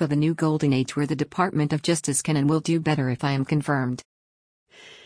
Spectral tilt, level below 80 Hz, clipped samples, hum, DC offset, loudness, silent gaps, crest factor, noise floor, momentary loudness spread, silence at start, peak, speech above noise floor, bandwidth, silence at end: -5.5 dB/octave; -58 dBFS; under 0.1%; none; under 0.1%; -24 LUFS; 4.05-4.66 s; 16 dB; under -90 dBFS; 4 LU; 0 s; -8 dBFS; over 67 dB; 10.5 kHz; 0.1 s